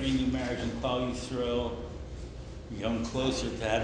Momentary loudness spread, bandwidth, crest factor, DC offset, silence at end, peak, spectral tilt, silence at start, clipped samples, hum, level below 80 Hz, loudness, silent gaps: 12 LU; 9.8 kHz; 16 dB; under 0.1%; 0 s; -16 dBFS; -5.5 dB/octave; 0 s; under 0.1%; none; -42 dBFS; -32 LUFS; none